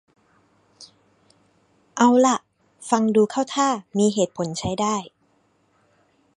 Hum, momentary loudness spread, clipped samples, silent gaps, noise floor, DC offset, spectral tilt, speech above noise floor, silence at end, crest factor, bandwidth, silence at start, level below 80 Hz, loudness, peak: none; 10 LU; under 0.1%; none; -64 dBFS; under 0.1%; -4.5 dB/octave; 44 dB; 1.3 s; 20 dB; 11 kHz; 0.8 s; -60 dBFS; -21 LUFS; -2 dBFS